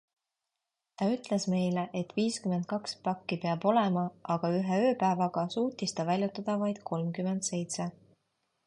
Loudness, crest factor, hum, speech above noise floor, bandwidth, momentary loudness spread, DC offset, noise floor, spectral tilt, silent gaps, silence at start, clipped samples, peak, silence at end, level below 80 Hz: -31 LUFS; 18 dB; none; 57 dB; 11.5 kHz; 7 LU; under 0.1%; -87 dBFS; -5.5 dB/octave; none; 1 s; under 0.1%; -14 dBFS; 0.75 s; -74 dBFS